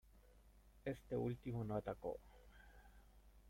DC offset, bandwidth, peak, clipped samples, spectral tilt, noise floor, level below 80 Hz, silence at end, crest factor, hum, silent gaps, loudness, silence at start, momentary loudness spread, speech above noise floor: under 0.1%; 16.5 kHz; -32 dBFS; under 0.1%; -8.5 dB/octave; -67 dBFS; -64 dBFS; 0 s; 18 dB; 60 Hz at -70 dBFS; none; -47 LUFS; 0.15 s; 22 LU; 22 dB